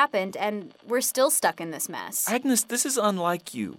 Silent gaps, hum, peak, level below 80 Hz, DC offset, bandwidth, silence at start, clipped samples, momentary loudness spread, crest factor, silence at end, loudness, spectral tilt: none; none; -8 dBFS; -78 dBFS; under 0.1%; 17.5 kHz; 0 s; under 0.1%; 9 LU; 18 dB; 0 s; -25 LUFS; -2.5 dB/octave